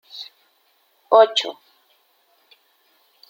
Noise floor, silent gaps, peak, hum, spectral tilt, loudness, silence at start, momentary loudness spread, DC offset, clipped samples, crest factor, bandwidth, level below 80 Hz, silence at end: -63 dBFS; none; -2 dBFS; none; -1 dB/octave; -17 LUFS; 0.15 s; 22 LU; under 0.1%; under 0.1%; 22 dB; 16 kHz; -86 dBFS; 1.8 s